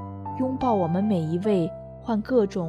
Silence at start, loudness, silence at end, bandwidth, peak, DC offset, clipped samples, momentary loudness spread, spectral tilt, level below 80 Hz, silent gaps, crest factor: 0 s; -25 LUFS; 0 s; 10.5 kHz; -10 dBFS; under 0.1%; under 0.1%; 8 LU; -9 dB/octave; -52 dBFS; none; 16 dB